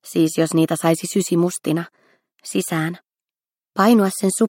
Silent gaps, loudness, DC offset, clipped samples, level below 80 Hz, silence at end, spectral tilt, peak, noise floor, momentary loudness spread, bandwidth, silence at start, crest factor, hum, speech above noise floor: none; -19 LUFS; under 0.1%; under 0.1%; -68 dBFS; 0 s; -5.5 dB/octave; -2 dBFS; under -90 dBFS; 13 LU; 17 kHz; 0.05 s; 18 dB; none; over 72 dB